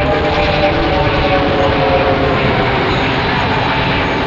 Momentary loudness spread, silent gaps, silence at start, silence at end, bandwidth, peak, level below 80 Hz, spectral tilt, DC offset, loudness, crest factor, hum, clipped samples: 2 LU; none; 0 s; 0 s; 7.8 kHz; 0 dBFS; -26 dBFS; -6.5 dB/octave; under 0.1%; -13 LUFS; 12 dB; none; under 0.1%